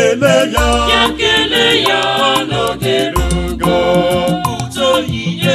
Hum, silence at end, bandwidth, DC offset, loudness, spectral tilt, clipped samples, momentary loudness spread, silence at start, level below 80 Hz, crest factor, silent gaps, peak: none; 0 s; 16 kHz; under 0.1%; -13 LUFS; -4 dB/octave; under 0.1%; 6 LU; 0 s; -26 dBFS; 12 dB; none; 0 dBFS